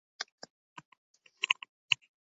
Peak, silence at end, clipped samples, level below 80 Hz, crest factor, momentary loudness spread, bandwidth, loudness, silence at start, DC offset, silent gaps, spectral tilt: -6 dBFS; 0.4 s; under 0.1%; -88 dBFS; 32 dB; 23 LU; 7.6 kHz; -33 LUFS; 0.2 s; under 0.1%; 0.32-0.38 s, 0.50-0.76 s, 0.85-0.92 s, 0.98-1.14 s, 1.69-1.89 s; 3.5 dB/octave